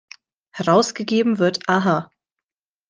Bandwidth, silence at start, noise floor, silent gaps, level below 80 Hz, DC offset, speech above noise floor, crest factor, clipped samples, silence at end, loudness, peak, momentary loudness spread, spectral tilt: 10 kHz; 0.55 s; under -90 dBFS; none; -66 dBFS; under 0.1%; over 72 dB; 18 dB; under 0.1%; 0.85 s; -19 LUFS; -2 dBFS; 8 LU; -5 dB/octave